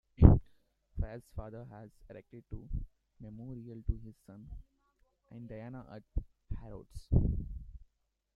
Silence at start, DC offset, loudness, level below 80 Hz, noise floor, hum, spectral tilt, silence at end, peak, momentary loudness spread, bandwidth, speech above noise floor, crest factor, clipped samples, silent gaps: 0.2 s; under 0.1%; -34 LUFS; -38 dBFS; -78 dBFS; none; -11 dB/octave; 0.6 s; -4 dBFS; 22 LU; 4.7 kHz; 40 dB; 30 dB; under 0.1%; none